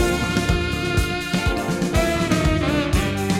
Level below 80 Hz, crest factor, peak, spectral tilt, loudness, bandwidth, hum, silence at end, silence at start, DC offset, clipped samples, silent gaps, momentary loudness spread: -28 dBFS; 16 dB; -4 dBFS; -5 dB/octave; -21 LUFS; 17 kHz; none; 0 s; 0 s; under 0.1%; under 0.1%; none; 3 LU